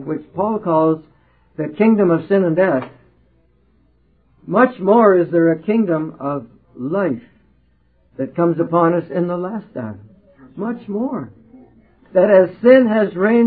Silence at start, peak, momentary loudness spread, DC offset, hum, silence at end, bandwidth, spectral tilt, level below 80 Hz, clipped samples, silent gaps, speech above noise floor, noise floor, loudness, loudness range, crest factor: 0 s; 0 dBFS; 16 LU; under 0.1%; none; 0 s; 4.7 kHz; -12.5 dB/octave; -60 dBFS; under 0.1%; none; 42 dB; -58 dBFS; -17 LUFS; 5 LU; 18 dB